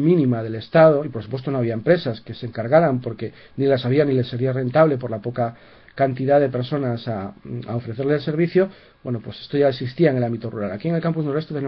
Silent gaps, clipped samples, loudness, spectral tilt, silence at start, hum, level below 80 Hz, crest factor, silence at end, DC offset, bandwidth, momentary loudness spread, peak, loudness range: none; under 0.1%; -21 LUFS; -10.5 dB/octave; 0 s; none; -58 dBFS; 18 dB; 0 s; under 0.1%; 5.6 kHz; 12 LU; -2 dBFS; 3 LU